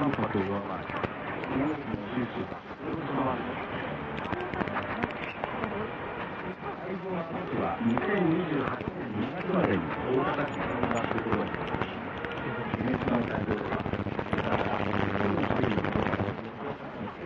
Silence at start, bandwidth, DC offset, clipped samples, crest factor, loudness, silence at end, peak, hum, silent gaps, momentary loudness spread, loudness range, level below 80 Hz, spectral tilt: 0 s; 7.4 kHz; under 0.1%; under 0.1%; 20 dB; -31 LUFS; 0 s; -12 dBFS; none; none; 8 LU; 4 LU; -54 dBFS; -7.5 dB/octave